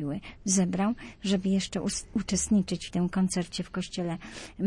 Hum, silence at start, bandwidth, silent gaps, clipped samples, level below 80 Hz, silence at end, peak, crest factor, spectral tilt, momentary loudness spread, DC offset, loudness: none; 0 s; 11.5 kHz; none; under 0.1%; -52 dBFS; 0 s; -12 dBFS; 16 dB; -4.5 dB/octave; 9 LU; under 0.1%; -29 LUFS